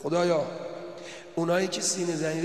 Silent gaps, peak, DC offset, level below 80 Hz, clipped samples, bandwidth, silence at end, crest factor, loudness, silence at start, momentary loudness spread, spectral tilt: none; -12 dBFS; 0.1%; -78 dBFS; under 0.1%; 13 kHz; 0 s; 16 dB; -28 LUFS; 0 s; 15 LU; -4 dB/octave